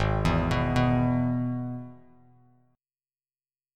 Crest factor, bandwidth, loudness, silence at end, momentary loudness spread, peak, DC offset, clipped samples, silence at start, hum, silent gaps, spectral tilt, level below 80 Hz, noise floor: 16 dB; 10.5 kHz; -26 LUFS; 1.8 s; 13 LU; -12 dBFS; under 0.1%; under 0.1%; 0 s; none; none; -7.5 dB/octave; -40 dBFS; under -90 dBFS